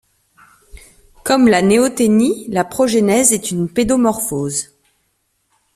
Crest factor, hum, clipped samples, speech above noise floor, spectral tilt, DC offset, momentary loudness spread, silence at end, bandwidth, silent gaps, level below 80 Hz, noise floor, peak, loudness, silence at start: 16 dB; none; under 0.1%; 51 dB; -4 dB/octave; under 0.1%; 9 LU; 1.1 s; 15 kHz; none; -46 dBFS; -66 dBFS; 0 dBFS; -15 LUFS; 0.75 s